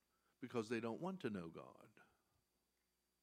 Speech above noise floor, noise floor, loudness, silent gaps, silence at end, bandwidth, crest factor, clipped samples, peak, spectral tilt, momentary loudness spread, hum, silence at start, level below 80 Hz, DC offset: 40 dB; -87 dBFS; -47 LUFS; none; 1.2 s; 15.5 kHz; 20 dB; under 0.1%; -30 dBFS; -6.5 dB/octave; 16 LU; 60 Hz at -75 dBFS; 0.4 s; -88 dBFS; under 0.1%